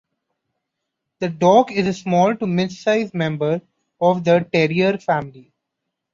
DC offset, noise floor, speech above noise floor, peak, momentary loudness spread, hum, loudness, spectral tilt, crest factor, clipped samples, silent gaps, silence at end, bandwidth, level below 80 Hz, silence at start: under 0.1%; -79 dBFS; 62 dB; -2 dBFS; 9 LU; none; -19 LUFS; -6.5 dB/octave; 18 dB; under 0.1%; none; 0.75 s; 7.6 kHz; -60 dBFS; 1.2 s